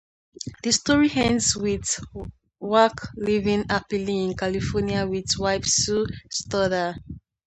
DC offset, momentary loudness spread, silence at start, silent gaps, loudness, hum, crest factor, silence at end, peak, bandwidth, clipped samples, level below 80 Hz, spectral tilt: under 0.1%; 17 LU; 0.4 s; none; -23 LUFS; none; 20 dB; 0.3 s; -4 dBFS; 9 kHz; under 0.1%; -44 dBFS; -3.5 dB/octave